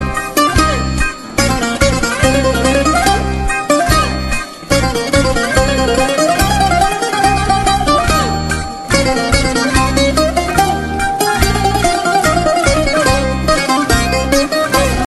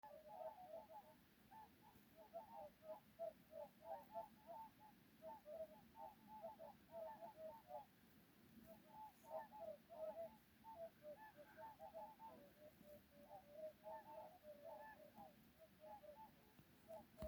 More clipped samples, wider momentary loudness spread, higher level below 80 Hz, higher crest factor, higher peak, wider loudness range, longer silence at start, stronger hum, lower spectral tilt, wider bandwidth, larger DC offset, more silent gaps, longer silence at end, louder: neither; second, 4 LU vs 11 LU; first, -22 dBFS vs -86 dBFS; second, 12 dB vs 18 dB; first, 0 dBFS vs -40 dBFS; about the same, 1 LU vs 3 LU; about the same, 0 s vs 0.05 s; neither; second, -4 dB/octave vs -5.5 dB/octave; second, 13 kHz vs over 20 kHz; neither; neither; about the same, 0 s vs 0 s; first, -13 LUFS vs -60 LUFS